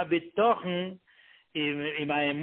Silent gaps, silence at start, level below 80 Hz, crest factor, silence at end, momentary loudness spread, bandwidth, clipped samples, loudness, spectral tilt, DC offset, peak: none; 0 s; -70 dBFS; 18 dB; 0 s; 10 LU; 4.3 kHz; under 0.1%; -29 LUFS; -9.5 dB/octave; under 0.1%; -12 dBFS